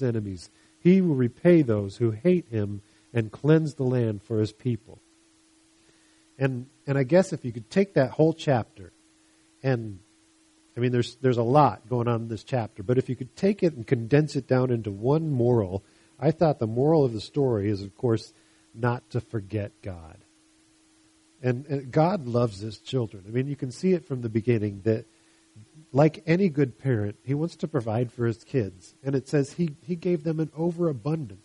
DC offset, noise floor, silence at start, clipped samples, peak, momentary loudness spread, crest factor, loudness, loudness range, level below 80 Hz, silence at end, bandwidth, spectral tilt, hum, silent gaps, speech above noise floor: under 0.1%; -61 dBFS; 0 s; under 0.1%; -4 dBFS; 10 LU; 22 dB; -26 LUFS; 5 LU; -62 dBFS; 0.1 s; 11 kHz; -8 dB/octave; none; none; 36 dB